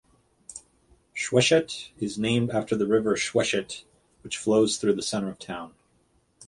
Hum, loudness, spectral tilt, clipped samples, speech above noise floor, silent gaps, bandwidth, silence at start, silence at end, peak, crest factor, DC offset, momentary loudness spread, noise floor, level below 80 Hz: none; -25 LUFS; -4 dB/octave; under 0.1%; 41 dB; none; 11.5 kHz; 0.5 s; 0 s; -6 dBFS; 22 dB; under 0.1%; 18 LU; -66 dBFS; -60 dBFS